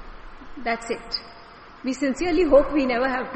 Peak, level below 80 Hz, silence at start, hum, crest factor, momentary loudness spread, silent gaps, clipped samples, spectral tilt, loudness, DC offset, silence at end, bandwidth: -6 dBFS; -40 dBFS; 0 s; none; 18 dB; 15 LU; none; under 0.1%; -4.5 dB/octave; -23 LUFS; under 0.1%; 0 s; 8.4 kHz